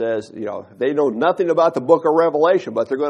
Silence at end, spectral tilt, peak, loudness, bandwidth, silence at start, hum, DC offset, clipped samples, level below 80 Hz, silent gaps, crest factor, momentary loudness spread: 0 s; -6.5 dB/octave; 0 dBFS; -17 LUFS; 9.6 kHz; 0 s; none; under 0.1%; under 0.1%; -68 dBFS; none; 16 dB; 11 LU